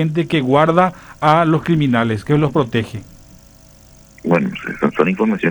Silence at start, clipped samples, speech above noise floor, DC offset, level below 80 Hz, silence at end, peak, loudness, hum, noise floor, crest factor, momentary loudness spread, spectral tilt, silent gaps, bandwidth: 0 s; under 0.1%; 29 dB; under 0.1%; -46 dBFS; 0 s; 0 dBFS; -16 LUFS; none; -45 dBFS; 16 dB; 8 LU; -7.5 dB/octave; none; over 20 kHz